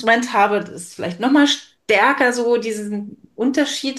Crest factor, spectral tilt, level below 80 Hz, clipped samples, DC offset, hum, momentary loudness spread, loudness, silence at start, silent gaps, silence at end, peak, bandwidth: 16 dB; -3.5 dB/octave; -68 dBFS; under 0.1%; under 0.1%; none; 13 LU; -18 LUFS; 0 s; none; 0 s; -2 dBFS; 12.5 kHz